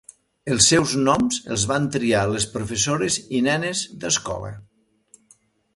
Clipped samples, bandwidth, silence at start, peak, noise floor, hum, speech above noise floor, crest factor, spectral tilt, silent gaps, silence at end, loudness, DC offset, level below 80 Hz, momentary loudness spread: under 0.1%; 11.5 kHz; 0.45 s; -2 dBFS; -59 dBFS; none; 37 dB; 22 dB; -3 dB/octave; none; 1.15 s; -21 LUFS; under 0.1%; -48 dBFS; 11 LU